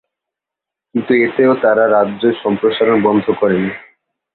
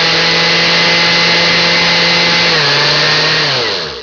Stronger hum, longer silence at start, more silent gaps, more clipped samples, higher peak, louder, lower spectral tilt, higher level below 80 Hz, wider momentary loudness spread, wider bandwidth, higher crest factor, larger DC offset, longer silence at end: neither; first, 0.95 s vs 0 s; neither; neither; about the same, -2 dBFS vs -2 dBFS; second, -14 LUFS vs -8 LUFS; first, -10.5 dB/octave vs -2.5 dB/octave; second, -56 dBFS vs -44 dBFS; first, 10 LU vs 2 LU; second, 4.4 kHz vs 5.4 kHz; about the same, 14 dB vs 10 dB; neither; first, 0.55 s vs 0 s